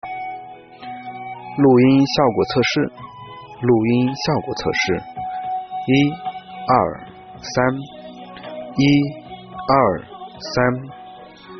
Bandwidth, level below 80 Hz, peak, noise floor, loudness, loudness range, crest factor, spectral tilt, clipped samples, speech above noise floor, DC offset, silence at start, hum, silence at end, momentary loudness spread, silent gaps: 6.4 kHz; -52 dBFS; -2 dBFS; -40 dBFS; -19 LUFS; 4 LU; 18 dB; -5 dB/octave; under 0.1%; 23 dB; under 0.1%; 0.05 s; none; 0 s; 21 LU; none